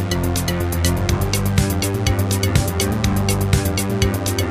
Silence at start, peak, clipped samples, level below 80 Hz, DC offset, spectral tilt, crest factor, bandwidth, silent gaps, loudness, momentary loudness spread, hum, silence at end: 0 s; -2 dBFS; under 0.1%; -28 dBFS; under 0.1%; -5 dB/octave; 16 dB; 15.5 kHz; none; -19 LUFS; 2 LU; none; 0 s